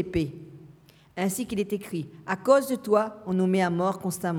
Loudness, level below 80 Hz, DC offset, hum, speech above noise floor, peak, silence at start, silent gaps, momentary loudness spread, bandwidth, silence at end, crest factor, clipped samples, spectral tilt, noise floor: -26 LUFS; -54 dBFS; under 0.1%; none; 28 dB; -8 dBFS; 0 s; none; 12 LU; 18 kHz; 0 s; 20 dB; under 0.1%; -6 dB/octave; -54 dBFS